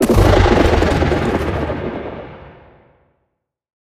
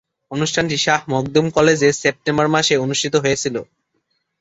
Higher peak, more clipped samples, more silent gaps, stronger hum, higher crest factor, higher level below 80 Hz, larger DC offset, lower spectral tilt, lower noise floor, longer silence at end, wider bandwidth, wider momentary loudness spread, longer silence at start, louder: about the same, 0 dBFS vs -2 dBFS; neither; neither; neither; about the same, 16 dB vs 16 dB; first, -24 dBFS vs -52 dBFS; neither; first, -6.5 dB/octave vs -4 dB/octave; about the same, -72 dBFS vs -69 dBFS; first, 1.5 s vs 0.8 s; first, 15.5 kHz vs 8.2 kHz; first, 18 LU vs 7 LU; second, 0 s vs 0.3 s; about the same, -15 LUFS vs -17 LUFS